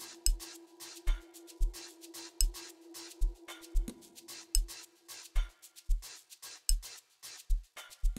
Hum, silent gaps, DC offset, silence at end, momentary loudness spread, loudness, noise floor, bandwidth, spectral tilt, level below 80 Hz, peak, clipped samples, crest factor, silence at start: none; none; under 0.1%; 0 s; 14 LU; -40 LUFS; -53 dBFS; 16 kHz; -2 dB/octave; -36 dBFS; -10 dBFS; under 0.1%; 26 dB; 0 s